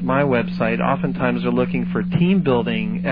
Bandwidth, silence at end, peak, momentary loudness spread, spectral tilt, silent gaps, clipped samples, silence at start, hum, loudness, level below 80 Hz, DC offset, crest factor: 5 kHz; 0 s; -4 dBFS; 4 LU; -10.5 dB/octave; none; under 0.1%; 0 s; none; -19 LUFS; -44 dBFS; under 0.1%; 14 dB